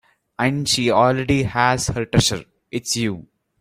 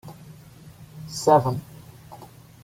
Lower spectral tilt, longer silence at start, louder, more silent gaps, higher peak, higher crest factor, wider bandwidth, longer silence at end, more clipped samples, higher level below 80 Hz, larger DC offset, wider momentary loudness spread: second, -4 dB/octave vs -6 dB/octave; first, 0.4 s vs 0.05 s; first, -19 LUFS vs -22 LUFS; neither; about the same, -2 dBFS vs -4 dBFS; second, 18 dB vs 24 dB; about the same, 16 kHz vs 16.5 kHz; about the same, 0.4 s vs 0.4 s; neither; first, -42 dBFS vs -58 dBFS; neither; second, 12 LU vs 26 LU